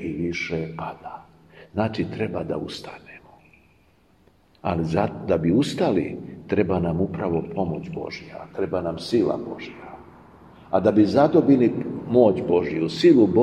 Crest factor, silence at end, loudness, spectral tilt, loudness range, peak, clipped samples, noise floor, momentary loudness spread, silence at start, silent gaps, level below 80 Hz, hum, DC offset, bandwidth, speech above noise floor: 20 dB; 0 s; -22 LUFS; -7.5 dB/octave; 10 LU; -4 dBFS; under 0.1%; -59 dBFS; 19 LU; 0 s; none; -52 dBFS; none; under 0.1%; 10.5 kHz; 37 dB